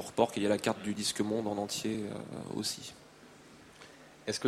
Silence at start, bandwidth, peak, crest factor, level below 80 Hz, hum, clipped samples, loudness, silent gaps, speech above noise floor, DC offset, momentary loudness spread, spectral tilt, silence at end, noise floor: 0 s; 16 kHz; -12 dBFS; 22 dB; -68 dBFS; none; under 0.1%; -34 LUFS; none; 22 dB; under 0.1%; 24 LU; -4 dB/octave; 0 s; -56 dBFS